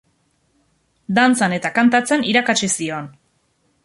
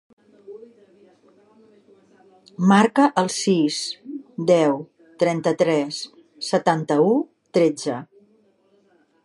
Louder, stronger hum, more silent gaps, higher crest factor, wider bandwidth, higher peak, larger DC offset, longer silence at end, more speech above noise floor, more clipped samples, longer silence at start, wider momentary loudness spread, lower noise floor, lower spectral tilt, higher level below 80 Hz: first, -17 LUFS vs -20 LUFS; neither; neither; about the same, 16 dB vs 20 dB; about the same, 11.5 kHz vs 11.5 kHz; about the same, -2 dBFS vs -2 dBFS; neither; second, 0.75 s vs 1.2 s; first, 47 dB vs 41 dB; neither; first, 1.1 s vs 0.5 s; second, 10 LU vs 17 LU; first, -64 dBFS vs -60 dBFS; second, -3.5 dB/octave vs -5.5 dB/octave; first, -62 dBFS vs -72 dBFS